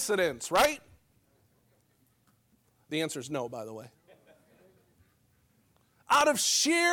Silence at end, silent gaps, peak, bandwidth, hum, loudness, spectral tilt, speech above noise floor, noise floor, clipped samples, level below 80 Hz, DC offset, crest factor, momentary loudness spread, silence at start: 0 s; none; -12 dBFS; 19 kHz; none; -27 LUFS; -2 dB/octave; 41 dB; -69 dBFS; under 0.1%; -64 dBFS; under 0.1%; 20 dB; 18 LU; 0 s